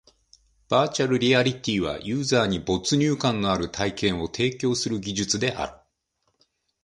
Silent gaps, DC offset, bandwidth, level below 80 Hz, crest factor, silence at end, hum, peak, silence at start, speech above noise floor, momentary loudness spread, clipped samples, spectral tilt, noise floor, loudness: none; under 0.1%; 11.5 kHz; -50 dBFS; 20 dB; 1.1 s; none; -6 dBFS; 0.7 s; 50 dB; 6 LU; under 0.1%; -4.5 dB/octave; -74 dBFS; -24 LUFS